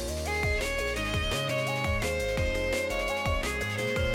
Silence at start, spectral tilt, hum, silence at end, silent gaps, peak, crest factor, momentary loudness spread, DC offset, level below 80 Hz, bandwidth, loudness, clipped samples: 0 s; -4 dB/octave; none; 0 s; none; -16 dBFS; 12 dB; 1 LU; under 0.1%; -38 dBFS; 16.5 kHz; -29 LUFS; under 0.1%